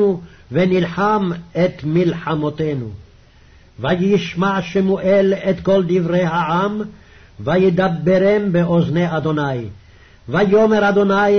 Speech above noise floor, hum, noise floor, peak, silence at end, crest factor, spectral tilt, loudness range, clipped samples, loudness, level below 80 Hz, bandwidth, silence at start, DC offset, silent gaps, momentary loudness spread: 31 dB; none; -47 dBFS; -6 dBFS; 0 s; 12 dB; -8 dB/octave; 3 LU; under 0.1%; -17 LUFS; -46 dBFS; 6.4 kHz; 0 s; under 0.1%; none; 9 LU